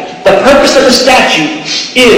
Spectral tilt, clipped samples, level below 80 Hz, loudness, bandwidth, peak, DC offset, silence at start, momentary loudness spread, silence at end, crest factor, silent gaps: -2.5 dB/octave; 2%; -34 dBFS; -6 LUFS; 17 kHz; 0 dBFS; under 0.1%; 0 s; 6 LU; 0 s; 6 dB; none